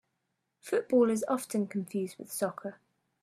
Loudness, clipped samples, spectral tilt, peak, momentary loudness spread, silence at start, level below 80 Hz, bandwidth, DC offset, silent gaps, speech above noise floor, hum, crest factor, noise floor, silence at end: -31 LUFS; under 0.1%; -5.5 dB/octave; -14 dBFS; 15 LU; 0.65 s; -80 dBFS; 15 kHz; under 0.1%; none; 51 dB; none; 18 dB; -82 dBFS; 0.5 s